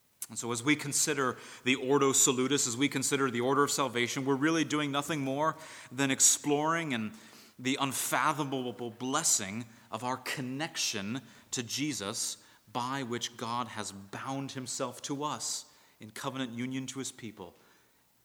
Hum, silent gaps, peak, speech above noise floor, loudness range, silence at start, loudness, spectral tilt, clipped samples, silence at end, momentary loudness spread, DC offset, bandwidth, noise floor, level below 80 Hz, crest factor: none; none; -10 dBFS; 35 dB; 9 LU; 0.2 s; -31 LUFS; -2.5 dB/octave; under 0.1%; 0.75 s; 14 LU; under 0.1%; over 20 kHz; -67 dBFS; -80 dBFS; 22 dB